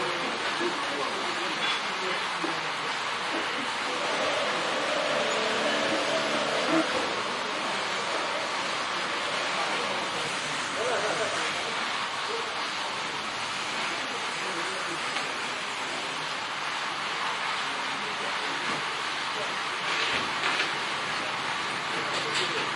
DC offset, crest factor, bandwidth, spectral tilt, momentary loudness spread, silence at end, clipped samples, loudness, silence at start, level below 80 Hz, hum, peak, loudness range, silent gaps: under 0.1%; 18 dB; 11.5 kHz; -1.5 dB/octave; 4 LU; 0 s; under 0.1%; -28 LUFS; 0 s; -70 dBFS; none; -10 dBFS; 3 LU; none